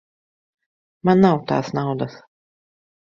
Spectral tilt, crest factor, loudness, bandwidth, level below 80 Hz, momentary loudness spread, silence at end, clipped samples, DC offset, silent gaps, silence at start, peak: -8 dB/octave; 20 dB; -19 LUFS; 7 kHz; -60 dBFS; 11 LU; 0.85 s; under 0.1%; under 0.1%; none; 1.05 s; -2 dBFS